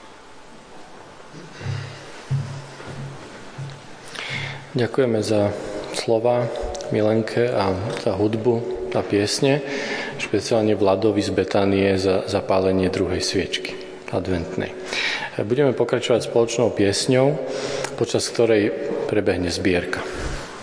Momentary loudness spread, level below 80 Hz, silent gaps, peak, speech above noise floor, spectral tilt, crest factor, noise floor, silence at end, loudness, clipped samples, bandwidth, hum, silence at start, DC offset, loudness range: 16 LU; -46 dBFS; none; -4 dBFS; 22 dB; -5 dB/octave; 18 dB; -42 dBFS; 0 s; -22 LUFS; under 0.1%; 10.5 kHz; none; 0 s; under 0.1%; 11 LU